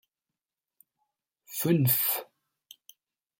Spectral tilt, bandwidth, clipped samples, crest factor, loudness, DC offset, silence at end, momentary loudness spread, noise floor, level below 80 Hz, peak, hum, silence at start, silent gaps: -5 dB/octave; 17 kHz; under 0.1%; 20 dB; -26 LUFS; under 0.1%; 1.15 s; 11 LU; -90 dBFS; -72 dBFS; -12 dBFS; none; 1.5 s; none